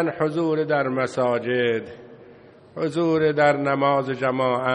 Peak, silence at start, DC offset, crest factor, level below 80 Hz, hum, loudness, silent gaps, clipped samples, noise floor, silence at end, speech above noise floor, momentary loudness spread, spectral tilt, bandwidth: -4 dBFS; 0 s; under 0.1%; 18 dB; -64 dBFS; none; -22 LUFS; none; under 0.1%; -48 dBFS; 0 s; 26 dB; 8 LU; -7 dB/octave; 10 kHz